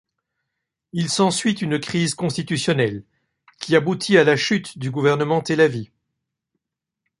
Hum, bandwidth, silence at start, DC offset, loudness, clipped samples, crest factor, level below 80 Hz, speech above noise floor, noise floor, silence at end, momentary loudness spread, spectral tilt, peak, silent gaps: none; 11.5 kHz; 0.95 s; under 0.1%; -20 LUFS; under 0.1%; 20 dB; -60 dBFS; 63 dB; -83 dBFS; 1.35 s; 10 LU; -5 dB/octave; -2 dBFS; none